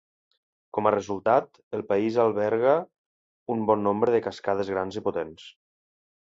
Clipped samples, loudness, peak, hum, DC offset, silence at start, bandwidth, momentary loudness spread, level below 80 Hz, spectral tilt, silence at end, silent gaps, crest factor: under 0.1%; -26 LUFS; -6 dBFS; none; under 0.1%; 0.75 s; 7.8 kHz; 11 LU; -64 dBFS; -7 dB/octave; 0.8 s; 1.63-1.71 s, 2.98-3.46 s; 20 dB